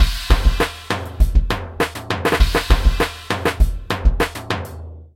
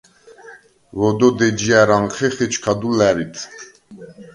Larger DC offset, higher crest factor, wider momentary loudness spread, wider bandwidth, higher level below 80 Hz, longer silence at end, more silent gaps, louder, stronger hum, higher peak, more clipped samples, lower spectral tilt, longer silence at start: neither; about the same, 18 dB vs 18 dB; second, 8 LU vs 18 LU; first, 16 kHz vs 11.5 kHz; first, -18 dBFS vs -50 dBFS; about the same, 0.15 s vs 0.1 s; neither; second, -20 LUFS vs -17 LUFS; neither; about the same, 0 dBFS vs 0 dBFS; neither; about the same, -5 dB/octave vs -5 dB/octave; second, 0 s vs 0.45 s